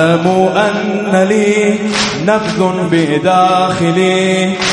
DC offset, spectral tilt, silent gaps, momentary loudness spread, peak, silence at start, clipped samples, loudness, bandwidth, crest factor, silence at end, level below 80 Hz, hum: under 0.1%; -5 dB/octave; none; 3 LU; 0 dBFS; 0 s; under 0.1%; -12 LUFS; 11.5 kHz; 12 dB; 0 s; -48 dBFS; none